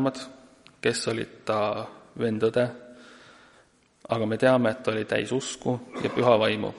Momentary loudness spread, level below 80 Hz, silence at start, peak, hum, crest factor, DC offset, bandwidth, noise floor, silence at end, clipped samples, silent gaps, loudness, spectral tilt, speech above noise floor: 10 LU; -64 dBFS; 0 s; -6 dBFS; none; 22 dB; under 0.1%; 11.5 kHz; -60 dBFS; 0 s; under 0.1%; none; -26 LUFS; -5 dB/octave; 35 dB